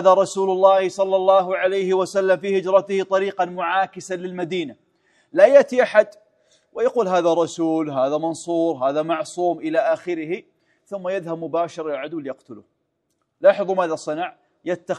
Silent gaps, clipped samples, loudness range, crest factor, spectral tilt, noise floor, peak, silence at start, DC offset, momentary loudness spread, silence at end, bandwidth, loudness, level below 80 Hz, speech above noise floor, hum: none; under 0.1%; 6 LU; 20 dB; -5 dB/octave; -73 dBFS; 0 dBFS; 0 s; under 0.1%; 13 LU; 0 s; 11 kHz; -20 LUFS; -74 dBFS; 53 dB; none